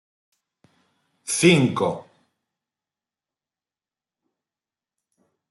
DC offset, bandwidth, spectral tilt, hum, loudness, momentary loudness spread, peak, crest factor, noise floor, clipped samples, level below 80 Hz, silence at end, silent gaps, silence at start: under 0.1%; 12 kHz; -4.5 dB/octave; none; -20 LUFS; 20 LU; -4 dBFS; 24 dB; under -90 dBFS; under 0.1%; -66 dBFS; 3.5 s; none; 1.25 s